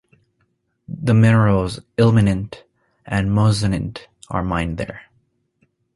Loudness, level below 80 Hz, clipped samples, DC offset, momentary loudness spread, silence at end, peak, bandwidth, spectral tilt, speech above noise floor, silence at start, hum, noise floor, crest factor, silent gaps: -18 LUFS; -38 dBFS; under 0.1%; under 0.1%; 17 LU; 0.95 s; -2 dBFS; 11.5 kHz; -7.5 dB/octave; 50 dB; 0.9 s; none; -67 dBFS; 18 dB; none